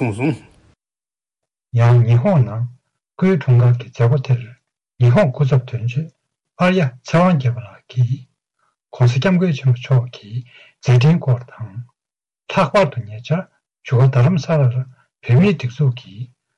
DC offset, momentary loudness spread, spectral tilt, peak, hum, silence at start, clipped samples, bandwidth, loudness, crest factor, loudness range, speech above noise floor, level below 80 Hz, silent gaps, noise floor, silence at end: under 0.1%; 16 LU; -8 dB/octave; -6 dBFS; none; 0 s; under 0.1%; 7.4 kHz; -17 LUFS; 10 dB; 3 LU; over 75 dB; -52 dBFS; none; under -90 dBFS; 0.3 s